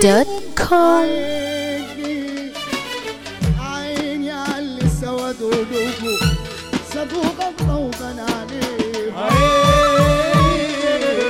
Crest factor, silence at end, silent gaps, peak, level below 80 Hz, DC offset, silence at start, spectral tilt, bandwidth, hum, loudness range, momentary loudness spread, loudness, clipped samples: 16 dB; 0 s; none; -2 dBFS; -32 dBFS; under 0.1%; 0 s; -5 dB/octave; 18 kHz; none; 7 LU; 12 LU; -19 LUFS; under 0.1%